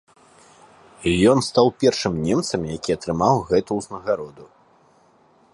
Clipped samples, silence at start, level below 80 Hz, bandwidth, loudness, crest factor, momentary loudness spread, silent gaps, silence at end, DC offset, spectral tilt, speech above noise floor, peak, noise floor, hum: under 0.1%; 1 s; -46 dBFS; 11.5 kHz; -21 LUFS; 20 dB; 10 LU; none; 1.1 s; under 0.1%; -5.5 dB/octave; 36 dB; -2 dBFS; -56 dBFS; none